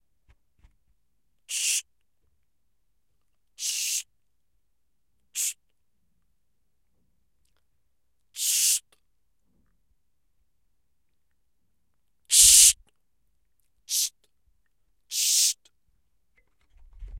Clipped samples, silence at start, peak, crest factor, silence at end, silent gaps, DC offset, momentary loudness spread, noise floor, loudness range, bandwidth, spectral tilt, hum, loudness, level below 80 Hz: under 0.1%; 1.5 s; -2 dBFS; 28 dB; 0 s; none; under 0.1%; 19 LU; -79 dBFS; 17 LU; 16.5 kHz; 4.5 dB/octave; none; -20 LUFS; -56 dBFS